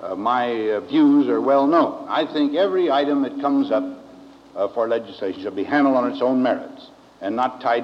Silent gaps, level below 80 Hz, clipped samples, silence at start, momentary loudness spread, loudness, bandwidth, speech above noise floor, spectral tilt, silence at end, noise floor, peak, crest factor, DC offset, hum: none; -70 dBFS; under 0.1%; 0 s; 11 LU; -20 LUFS; 6.4 kHz; 24 dB; -6.5 dB/octave; 0 s; -44 dBFS; -6 dBFS; 14 dB; under 0.1%; none